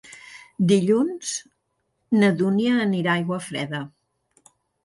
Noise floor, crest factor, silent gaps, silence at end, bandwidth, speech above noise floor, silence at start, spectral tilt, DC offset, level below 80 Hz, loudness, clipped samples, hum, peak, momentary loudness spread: -73 dBFS; 18 dB; none; 0.95 s; 11.5 kHz; 52 dB; 0.1 s; -5.5 dB/octave; under 0.1%; -66 dBFS; -22 LUFS; under 0.1%; none; -6 dBFS; 18 LU